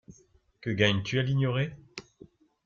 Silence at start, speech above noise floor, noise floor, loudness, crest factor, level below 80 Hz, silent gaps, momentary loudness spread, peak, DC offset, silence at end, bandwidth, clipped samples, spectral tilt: 0.1 s; 35 dB; -62 dBFS; -28 LUFS; 20 dB; -60 dBFS; none; 20 LU; -10 dBFS; under 0.1%; 0.65 s; 7.4 kHz; under 0.1%; -6 dB/octave